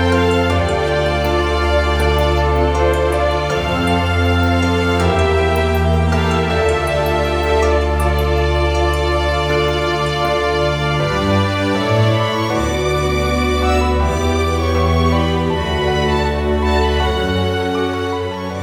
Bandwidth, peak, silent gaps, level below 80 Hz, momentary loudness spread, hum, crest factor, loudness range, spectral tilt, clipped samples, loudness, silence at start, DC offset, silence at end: 15.5 kHz; -2 dBFS; none; -22 dBFS; 3 LU; none; 12 dB; 1 LU; -6 dB/octave; under 0.1%; -16 LUFS; 0 s; under 0.1%; 0 s